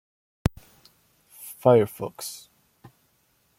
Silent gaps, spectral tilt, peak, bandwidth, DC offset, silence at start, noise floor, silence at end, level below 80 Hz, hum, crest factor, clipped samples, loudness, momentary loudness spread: none; -6.5 dB/octave; -4 dBFS; 16.5 kHz; under 0.1%; 1.4 s; -67 dBFS; 1.25 s; -46 dBFS; none; 24 dB; under 0.1%; -25 LUFS; 23 LU